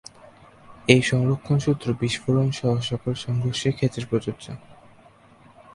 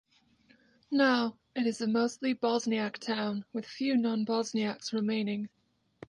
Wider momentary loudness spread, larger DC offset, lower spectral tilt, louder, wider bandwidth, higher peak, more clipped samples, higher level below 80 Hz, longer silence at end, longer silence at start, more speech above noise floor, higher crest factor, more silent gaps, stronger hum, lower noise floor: first, 12 LU vs 8 LU; neither; first, -6 dB/octave vs -4.5 dB/octave; first, -23 LUFS vs -31 LUFS; about the same, 11.5 kHz vs 10.5 kHz; first, 0 dBFS vs -14 dBFS; neither; first, -52 dBFS vs -78 dBFS; first, 1 s vs 0.6 s; second, 0.7 s vs 0.9 s; second, 30 dB vs 35 dB; first, 24 dB vs 16 dB; neither; neither; second, -52 dBFS vs -65 dBFS